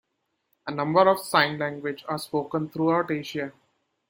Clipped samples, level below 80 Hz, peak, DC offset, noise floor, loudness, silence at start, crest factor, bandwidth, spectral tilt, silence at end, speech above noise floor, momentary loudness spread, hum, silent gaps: under 0.1%; -70 dBFS; -4 dBFS; under 0.1%; -77 dBFS; -25 LUFS; 0.65 s; 22 dB; 17 kHz; -5.5 dB/octave; 0.6 s; 52 dB; 13 LU; none; none